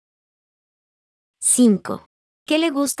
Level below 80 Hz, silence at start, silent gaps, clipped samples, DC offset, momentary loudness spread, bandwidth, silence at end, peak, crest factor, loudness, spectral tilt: -70 dBFS; 1.4 s; 2.06-2.46 s; under 0.1%; under 0.1%; 14 LU; 12 kHz; 0.05 s; -6 dBFS; 16 dB; -18 LUFS; -3.5 dB/octave